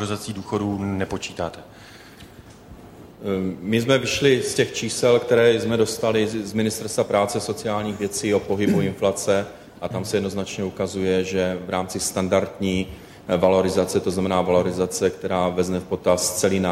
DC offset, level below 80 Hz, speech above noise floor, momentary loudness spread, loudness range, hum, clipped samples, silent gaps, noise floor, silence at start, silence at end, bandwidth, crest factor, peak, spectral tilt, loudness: under 0.1%; -52 dBFS; 22 dB; 9 LU; 5 LU; none; under 0.1%; none; -44 dBFS; 0 s; 0 s; 16 kHz; 18 dB; -6 dBFS; -4.5 dB/octave; -22 LUFS